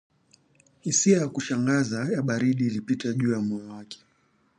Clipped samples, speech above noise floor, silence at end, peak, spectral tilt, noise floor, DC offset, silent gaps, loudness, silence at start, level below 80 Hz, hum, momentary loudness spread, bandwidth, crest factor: under 0.1%; 41 dB; 0.65 s; -8 dBFS; -5 dB/octave; -66 dBFS; under 0.1%; none; -25 LUFS; 0.85 s; -68 dBFS; none; 17 LU; 10.5 kHz; 18 dB